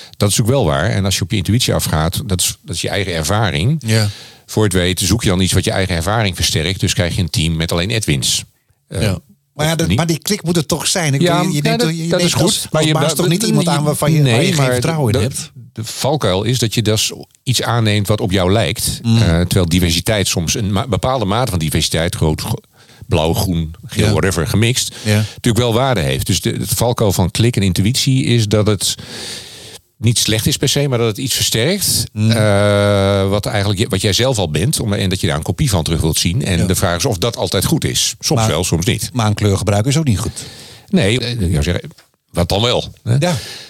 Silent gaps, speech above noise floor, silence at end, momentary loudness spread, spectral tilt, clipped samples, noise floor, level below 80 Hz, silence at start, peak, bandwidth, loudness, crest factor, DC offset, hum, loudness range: none; 22 dB; 0 s; 6 LU; -4.5 dB/octave; under 0.1%; -37 dBFS; -34 dBFS; 0 s; -2 dBFS; 16.5 kHz; -15 LUFS; 12 dB; under 0.1%; none; 3 LU